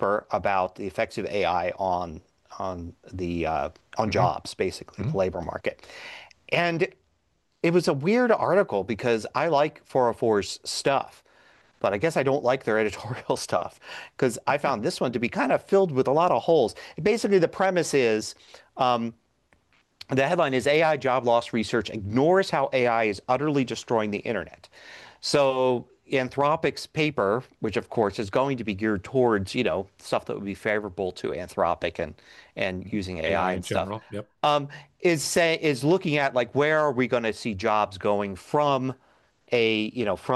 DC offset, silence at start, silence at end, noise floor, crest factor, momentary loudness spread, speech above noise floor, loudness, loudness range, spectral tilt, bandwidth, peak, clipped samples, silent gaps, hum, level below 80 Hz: under 0.1%; 0 s; 0 s; -71 dBFS; 16 dB; 11 LU; 46 dB; -25 LUFS; 5 LU; -5 dB/octave; 12.5 kHz; -10 dBFS; under 0.1%; none; none; -58 dBFS